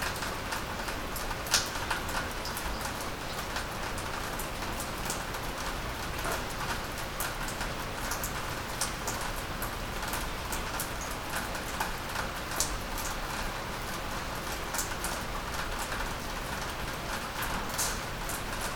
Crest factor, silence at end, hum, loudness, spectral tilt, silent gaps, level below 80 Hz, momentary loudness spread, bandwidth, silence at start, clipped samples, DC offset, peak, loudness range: 26 dB; 0 s; none; -34 LUFS; -2.5 dB/octave; none; -42 dBFS; 4 LU; over 20 kHz; 0 s; under 0.1%; under 0.1%; -10 dBFS; 2 LU